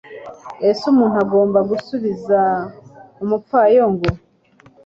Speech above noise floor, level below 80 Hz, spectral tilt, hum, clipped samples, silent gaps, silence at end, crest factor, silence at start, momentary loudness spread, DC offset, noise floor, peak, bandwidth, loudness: 35 dB; -44 dBFS; -8 dB/octave; none; under 0.1%; none; 0.7 s; 16 dB; 0.1 s; 19 LU; under 0.1%; -51 dBFS; -2 dBFS; 7.6 kHz; -17 LUFS